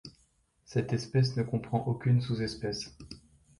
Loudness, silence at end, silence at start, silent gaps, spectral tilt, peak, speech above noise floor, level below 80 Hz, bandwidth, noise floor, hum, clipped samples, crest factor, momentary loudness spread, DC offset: -31 LUFS; 0.4 s; 0.05 s; none; -6.5 dB/octave; -14 dBFS; 40 dB; -58 dBFS; 11 kHz; -70 dBFS; none; under 0.1%; 18 dB; 21 LU; under 0.1%